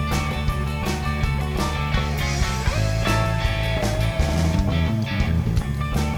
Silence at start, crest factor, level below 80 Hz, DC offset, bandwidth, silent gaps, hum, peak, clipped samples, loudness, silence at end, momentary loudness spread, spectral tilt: 0 s; 14 dB; -26 dBFS; under 0.1%; 19 kHz; none; none; -8 dBFS; under 0.1%; -23 LUFS; 0 s; 3 LU; -5.5 dB/octave